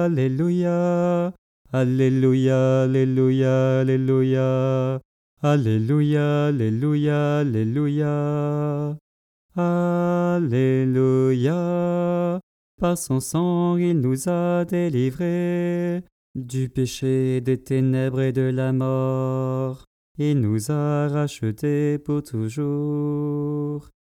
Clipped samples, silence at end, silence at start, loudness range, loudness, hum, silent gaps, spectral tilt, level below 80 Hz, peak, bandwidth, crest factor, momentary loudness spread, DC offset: under 0.1%; 0.35 s; 0 s; 4 LU; -22 LUFS; none; 1.38-1.65 s, 5.05-5.37 s, 9.01-9.49 s, 12.43-12.78 s, 16.12-16.34 s, 19.87-20.15 s; -8 dB/octave; -56 dBFS; -8 dBFS; 14 kHz; 14 dB; 8 LU; under 0.1%